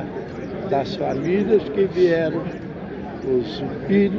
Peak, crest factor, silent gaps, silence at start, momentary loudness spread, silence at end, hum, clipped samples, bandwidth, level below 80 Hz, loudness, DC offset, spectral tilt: -6 dBFS; 16 dB; none; 0 s; 13 LU; 0 s; none; under 0.1%; 6.8 kHz; -48 dBFS; -22 LUFS; under 0.1%; -8 dB/octave